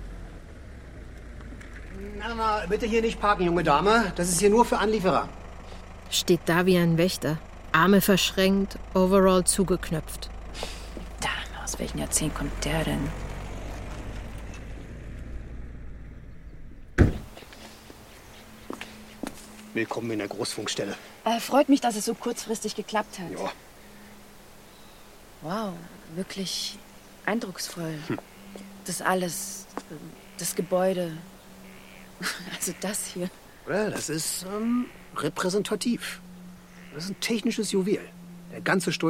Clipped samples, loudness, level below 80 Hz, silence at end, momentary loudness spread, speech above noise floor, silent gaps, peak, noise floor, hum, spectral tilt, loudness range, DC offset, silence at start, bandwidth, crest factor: under 0.1%; -26 LUFS; -42 dBFS; 0 s; 23 LU; 23 dB; none; -6 dBFS; -49 dBFS; none; -4.5 dB/octave; 12 LU; under 0.1%; 0 s; 16.5 kHz; 22 dB